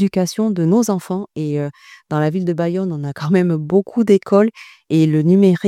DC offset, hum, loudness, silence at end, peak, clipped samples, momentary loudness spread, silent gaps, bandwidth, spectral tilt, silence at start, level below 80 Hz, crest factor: under 0.1%; none; -17 LUFS; 0 s; -2 dBFS; under 0.1%; 10 LU; none; 14 kHz; -7.5 dB/octave; 0 s; -62 dBFS; 14 dB